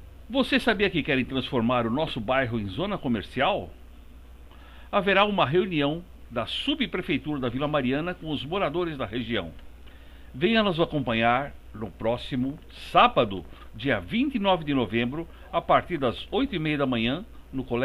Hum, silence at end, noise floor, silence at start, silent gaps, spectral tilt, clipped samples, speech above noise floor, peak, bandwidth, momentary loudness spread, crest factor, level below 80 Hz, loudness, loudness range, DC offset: none; 0 s; -46 dBFS; 0 s; none; -7 dB/octave; under 0.1%; 20 dB; -6 dBFS; 15 kHz; 10 LU; 20 dB; -46 dBFS; -26 LUFS; 3 LU; under 0.1%